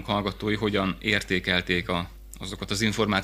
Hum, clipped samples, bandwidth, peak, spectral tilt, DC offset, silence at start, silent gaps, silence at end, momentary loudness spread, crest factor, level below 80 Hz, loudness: none; under 0.1%; 16 kHz; -6 dBFS; -4.5 dB/octave; under 0.1%; 0 s; none; 0 s; 12 LU; 22 dB; -44 dBFS; -26 LUFS